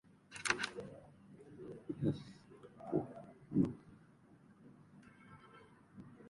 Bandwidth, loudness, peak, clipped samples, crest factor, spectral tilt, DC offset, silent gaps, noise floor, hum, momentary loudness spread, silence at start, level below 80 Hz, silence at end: 11.5 kHz; -40 LUFS; -16 dBFS; under 0.1%; 28 dB; -5 dB/octave; under 0.1%; none; -64 dBFS; none; 25 LU; 0.3 s; -70 dBFS; 0 s